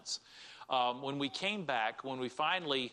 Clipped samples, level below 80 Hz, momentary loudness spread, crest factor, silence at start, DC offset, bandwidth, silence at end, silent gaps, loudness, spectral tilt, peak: under 0.1%; -82 dBFS; 8 LU; 20 dB; 0 s; under 0.1%; 11 kHz; 0 s; none; -35 LUFS; -3 dB/octave; -18 dBFS